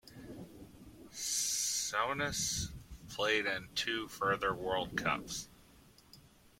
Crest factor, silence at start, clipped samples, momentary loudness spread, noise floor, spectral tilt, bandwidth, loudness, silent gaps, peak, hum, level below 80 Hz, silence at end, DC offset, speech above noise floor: 22 dB; 0.05 s; under 0.1%; 20 LU; -62 dBFS; -1.5 dB/octave; 16.5 kHz; -35 LUFS; none; -16 dBFS; none; -58 dBFS; 0.1 s; under 0.1%; 26 dB